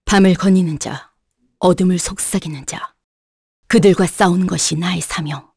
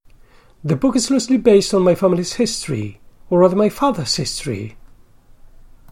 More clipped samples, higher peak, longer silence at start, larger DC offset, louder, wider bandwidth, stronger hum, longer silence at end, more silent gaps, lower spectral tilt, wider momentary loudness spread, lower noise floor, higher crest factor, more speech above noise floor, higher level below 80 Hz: neither; about the same, -2 dBFS vs -2 dBFS; second, 0.05 s vs 0.6 s; neither; about the same, -16 LUFS vs -17 LUFS; second, 11 kHz vs 16.5 kHz; neither; second, 0.15 s vs 1.2 s; first, 3.04-3.63 s vs none; about the same, -5 dB/octave vs -5 dB/octave; about the same, 14 LU vs 13 LU; first, -65 dBFS vs -47 dBFS; about the same, 16 dB vs 18 dB; first, 50 dB vs 31 dB; about the same, -40 dBFS vs -44 dBFS